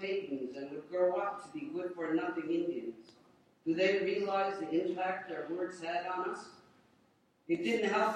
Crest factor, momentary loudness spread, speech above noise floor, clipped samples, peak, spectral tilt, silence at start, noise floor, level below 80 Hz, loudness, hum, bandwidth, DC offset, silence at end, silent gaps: 16 dB; 11 LU; 36 dB; under 0.1%; -18 dBFS; -5.5 dB/octave; 0 s; -70 dBFS; -82 dBFS; -35 LUFS; none; 10 kHz; under 0.1%; 0 s; none